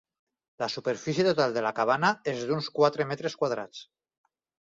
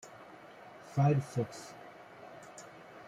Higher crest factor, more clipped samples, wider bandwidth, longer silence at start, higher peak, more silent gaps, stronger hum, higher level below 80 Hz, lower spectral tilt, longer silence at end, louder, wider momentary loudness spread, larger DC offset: about the same, 20 dB vs 20 dB; neither; second, 7.8 kHz vs 11.5 kHz; first, 0.6 s vs 0.05 s; first, -8 dBFS vs -16 dBFS; neither; neither; about the same, -72 dBFS vs -72 dBFS; second, -5 dB/octave vs -7.5 dB/octave; first, 0.85 s vs 0 s; first, -28 LUFS vs -33 LUFS; second, 10 LU vs 23 LU; neither